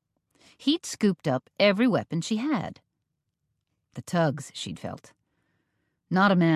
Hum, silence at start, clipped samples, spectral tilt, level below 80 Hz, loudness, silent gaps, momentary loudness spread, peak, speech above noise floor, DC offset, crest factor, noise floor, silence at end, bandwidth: none; 0.6 s; under 0.1%; -5.5 dB/octave; -66 dBFS; -26 LUFS; none; 17 LU; -10 dBFS; 55 dB; under 0.1%; 18 dB; -81 dBFS; 0 s; 13.5 kHz